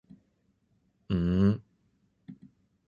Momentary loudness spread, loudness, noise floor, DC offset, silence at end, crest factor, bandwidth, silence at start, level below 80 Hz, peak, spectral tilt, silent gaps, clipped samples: 26 LU; -28 LUFS; -72 dBFS; under 0.1%; 0.55 s; 20 dB; 6.8 kHz; 1.1 s; -48 dBFS; -12 dBFS; -10 dB/octave; none; under 0.1%